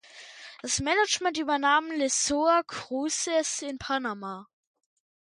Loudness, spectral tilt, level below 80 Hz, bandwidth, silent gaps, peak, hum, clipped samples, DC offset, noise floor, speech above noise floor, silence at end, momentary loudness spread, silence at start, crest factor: -26 LUFS; -1.5 dB/octave; -60 dBFS; 11.5 kHz; none; -10 dBFS; none; under 0.1%; under 0.1%; -47 dBFS; 20 dB; 0.9 s; 16 LU; 0.15 s; 18 dB